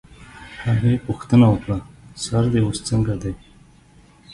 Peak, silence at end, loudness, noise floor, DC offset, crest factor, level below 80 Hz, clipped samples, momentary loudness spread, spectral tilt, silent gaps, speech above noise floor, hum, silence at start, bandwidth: -2 dBFS; 0 s; -20 LUFS; -50 dBFS; under 0.1%; 18 dB; -40 dBFS; under 0.1%; 22 LU; -7 dB/octave; none; 32 dB; none; 0.2 s; 11.5 kHz